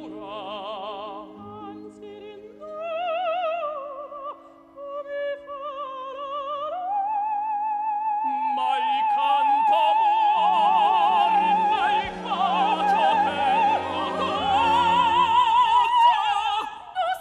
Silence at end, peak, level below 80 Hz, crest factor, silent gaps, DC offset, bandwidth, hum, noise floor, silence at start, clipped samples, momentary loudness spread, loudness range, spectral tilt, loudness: 0 s; -8 dBFS; -60 dBFS; 16 dB; none; under 0.1%; 11.5 kHz; none; -45 dBFS; 0 s; under 0.1%; 18 LU; 11 LU; -4 dB/octave; -22 LUFS